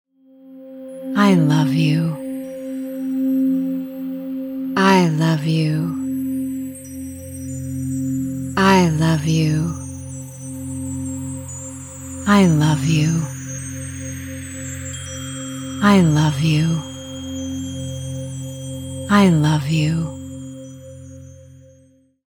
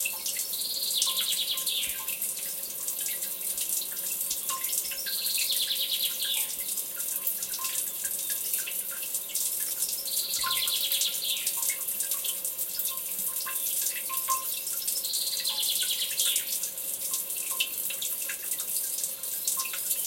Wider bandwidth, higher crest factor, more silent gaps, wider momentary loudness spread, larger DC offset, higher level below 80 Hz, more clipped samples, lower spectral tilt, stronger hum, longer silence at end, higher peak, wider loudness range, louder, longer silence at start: about the same, 17.5 kHz vs 17 kHz; about the same, 18 dB vs 22 dB; neither; first, 18 LU vs 5 LU; neither; first, -48 dBFS vs -70 dBFS; neither; first, -6 dB/octave vs 2.5 dB/octave; neither; first, 0.75 s vs 0 s; first, -2 dBFS vs -8 dBFS; about the same, 3 LU vs 2 LU; first, -20 LUFS vs -28 LUFS; first, 0.45 s vs 0 s